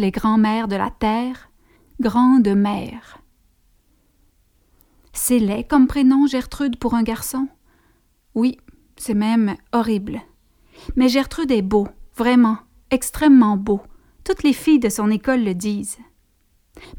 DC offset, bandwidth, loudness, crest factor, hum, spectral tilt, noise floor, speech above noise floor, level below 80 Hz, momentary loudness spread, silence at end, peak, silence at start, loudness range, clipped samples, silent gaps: under 0.1%; 19 kHz; -19 LUFS; 16 dB; none; -5.5 dB/octave; -61 dBFS; 43 dB; -42 dBFS; 15 LU; 0 s; -4 dBFS; 0 s; 5 LU; under 0.1%; none